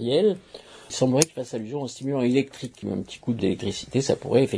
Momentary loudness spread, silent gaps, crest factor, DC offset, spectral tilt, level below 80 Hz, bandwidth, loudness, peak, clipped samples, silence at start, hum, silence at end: 13 LU; none; 24 dB; under 0.1%; -5 dB/octave; -58 dBFS; 11 kHz; -25 LUFS; 0 dBFS; under 0.1%; 0 s; none; 0 s